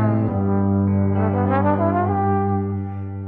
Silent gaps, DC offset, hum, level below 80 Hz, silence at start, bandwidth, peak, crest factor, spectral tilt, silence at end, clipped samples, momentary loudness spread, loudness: none; under 0.1%; none; -54 dBFS; 0 s; 3.4 kHz; -6 dBFS; 14 dB; -12.5 dB/octave; 0 s; under 0.1%; 5 LU; -20 LUFS